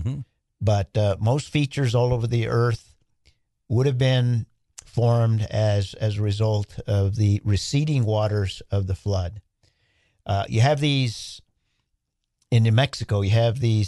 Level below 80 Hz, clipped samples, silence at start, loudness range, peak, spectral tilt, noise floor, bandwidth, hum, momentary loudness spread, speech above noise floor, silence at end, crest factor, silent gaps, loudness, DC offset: -46 dBFS; under 0.1%; 0 s; 3 LU; -6 dBFS; -6.5 dB/octave; -77 dBFS; 11 kHz; none; 8 LU; 55 dB; 0 s; 16 dB; none; -23 LUFS; under 0.1%